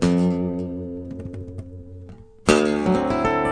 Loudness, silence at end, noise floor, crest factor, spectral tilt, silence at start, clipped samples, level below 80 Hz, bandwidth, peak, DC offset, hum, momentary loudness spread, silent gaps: -22 LUFS; 0 s; -42 dBFS; 22 dB; -6 dB/octave; 0 s; under 0.1%; -44 dBFS; 10 kHz; -2 dBFS; under 0.1%; none; 21 LU; none